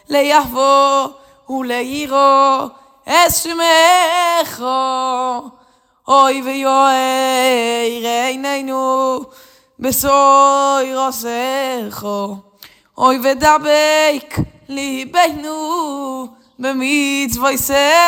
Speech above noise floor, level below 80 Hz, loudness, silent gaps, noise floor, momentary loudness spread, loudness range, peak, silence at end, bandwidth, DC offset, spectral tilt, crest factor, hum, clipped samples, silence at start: 39 dB; -48 dBFS; -14 LUFS; none; -53 dBFS; 13 LU; 4 LU; 0 dBFS; 0 s; over 20 kHz; under 0.1%; -2.5 dB/octave; 14 dB; none; under 0.1%; 0.1 s